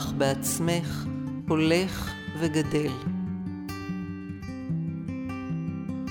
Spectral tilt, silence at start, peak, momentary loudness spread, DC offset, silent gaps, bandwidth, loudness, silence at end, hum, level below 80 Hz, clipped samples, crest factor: -5.5 dB/octave; 0 s; -10 dBFS; 10 LU; under 0.1%; none; 18 kHz; -29 LUFS; 0 s; none; -50 dBFS; under 0.1%; 18 dB